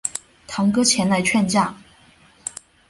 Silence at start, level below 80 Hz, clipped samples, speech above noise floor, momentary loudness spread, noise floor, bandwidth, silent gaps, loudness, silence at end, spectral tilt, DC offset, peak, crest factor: 0.05 s; -56 dBFS; under 0.1%; 34 dB; 16 LU; -52 dBFS; 11.5 kHz; none; -19 LUFS; 0.4 s; -3.5 dB/octave; under 0.1%; -4 dBFS; 18 dB